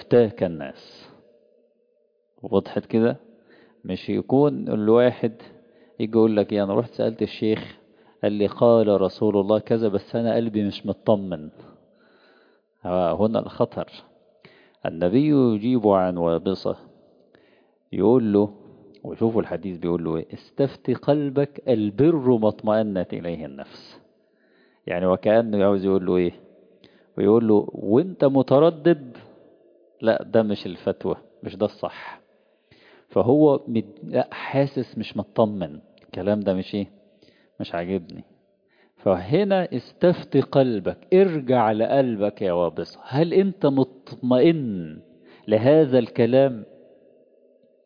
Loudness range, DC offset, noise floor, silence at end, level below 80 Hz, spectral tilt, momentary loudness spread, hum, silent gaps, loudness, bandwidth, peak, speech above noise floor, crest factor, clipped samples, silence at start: 6 LU; under 0.1%; -66 dBFS; 1.2 s; -62 dBFS; -10 dB/octave; 15 LU; none; none; -22 LUFS; 5.2 kHz; -4 dBFS; 45 dB; 18 dB; under 0.1%; 0 s